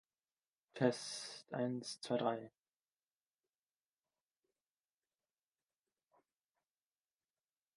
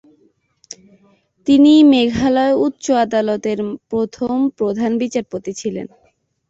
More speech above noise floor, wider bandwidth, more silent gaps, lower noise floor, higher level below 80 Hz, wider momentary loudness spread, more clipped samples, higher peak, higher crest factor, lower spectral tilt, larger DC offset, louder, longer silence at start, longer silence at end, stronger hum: first, over 50 dB vs 45 dB; first, 11.5 kHz vs 8 kHz; neither; first, under -90 dBFS vs -60 dBFS; second, under -90 dBFS vs -50 dBFS; second, 10 LU vs 19 LU; neither; second, -18 dBFS vs -2 dBFS; first, 28 dB vs 14 dB; about the same, -5 dB/octave vs -5 dB/octave; neither; second, -41 LUFS vs -16 LUFS; second, 0.75 s vs 1.45 s; first, 5.25 s vs 0.65 s; neither